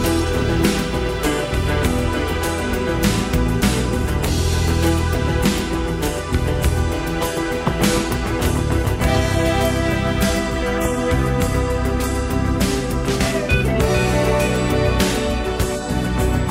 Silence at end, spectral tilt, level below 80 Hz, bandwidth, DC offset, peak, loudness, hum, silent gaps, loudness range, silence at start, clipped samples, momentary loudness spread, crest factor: 0 s; -5.5 dB/octave; -24 dBFS; 16.5 kHz; under 0.1%; -4 dBFS; -19 LUFS; none; none; 1 LU; 0 s; under 0.1%; 4 LU; 14 dB